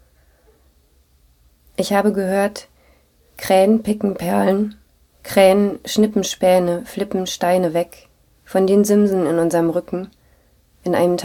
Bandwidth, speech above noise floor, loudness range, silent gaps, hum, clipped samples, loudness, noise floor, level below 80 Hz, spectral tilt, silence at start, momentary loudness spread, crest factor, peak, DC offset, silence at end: 18.5 kHz; 40 dB; 3 LU; none; none; under 0.1%; -18 LUFS; -56 dBFS; -52 dBFS; -5.5 dB/octave; 1.8 s; 14 LU; 18 dB; 0 dBFS; under 0.1%; 0 s